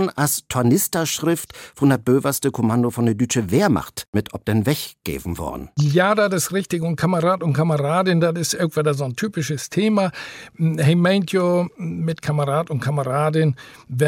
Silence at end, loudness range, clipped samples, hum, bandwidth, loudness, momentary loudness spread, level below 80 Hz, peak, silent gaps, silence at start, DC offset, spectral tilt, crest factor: 0 s; 2 LU; under 0.1%; none; 17 kHz; -20 LUFS; 8 LU; -52 dBFS; -6 dBFS; 4.08-4.13 s; 0 s; under 0.1%; -5.5 dB/octave; 14 dB